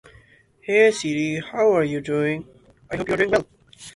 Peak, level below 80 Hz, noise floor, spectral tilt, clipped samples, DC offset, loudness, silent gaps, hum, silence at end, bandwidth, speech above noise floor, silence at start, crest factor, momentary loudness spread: -4 dBFS; -54 dBFS; -54 dBFS; -5 dB/octave; under 0.1%; under 0.1%; -21 LUFS; none; none; 0.05 s; 11.5 kHz; 33 dB; 0.65 s; 18 dB; 14 LU